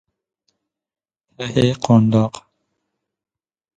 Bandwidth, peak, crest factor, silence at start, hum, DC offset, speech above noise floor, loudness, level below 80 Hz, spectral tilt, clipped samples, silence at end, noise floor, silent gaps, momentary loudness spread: 9.2 kHz; -2 dBFS; 20 dB; 1.4 s; none; under 0.1%; 61 dB; -17 LUFS; -52 dBFS; -7 dB/octave; under 0.1%; 1.35 s; -77 dBFS; none; 15 LU